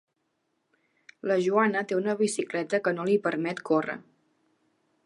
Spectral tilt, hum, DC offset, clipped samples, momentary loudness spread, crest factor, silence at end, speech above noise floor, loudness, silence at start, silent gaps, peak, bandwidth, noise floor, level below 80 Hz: -5 dB/octave; none; under 0.1%; under 0.1%; 7 LU; 20 dB; 1.05 s; 50 dB; -27 LUFS; 1.25 s; none; -10 dBFS; 11.5 kHz; -77 dBFS; -80 dBFS